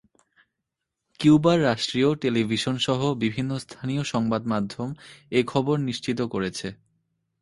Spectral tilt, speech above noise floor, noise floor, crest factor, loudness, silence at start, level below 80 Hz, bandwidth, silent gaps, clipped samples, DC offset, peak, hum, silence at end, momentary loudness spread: -6 dB/octave; 59 dB; -83 dBFS; 20 dB; -24 LUFS; 1.2 s; -58 dBFS; 11.5 kHz; none; under 0.1%; under 0.1%; -6 dBFS; none; 0.65 s; 12 LU